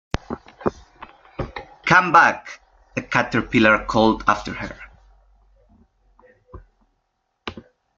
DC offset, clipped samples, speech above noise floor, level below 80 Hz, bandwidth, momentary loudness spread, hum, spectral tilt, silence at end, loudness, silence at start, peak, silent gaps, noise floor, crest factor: under 0.1%; under 0.1%; 55 dB; -44 dBFS; 7.6 kHz; 22 LU; none; -5 dB/octave; 0.35 s; -19 LUFS; 0.3 s; 0 dBFS; none; -73 dBFS; 22 dB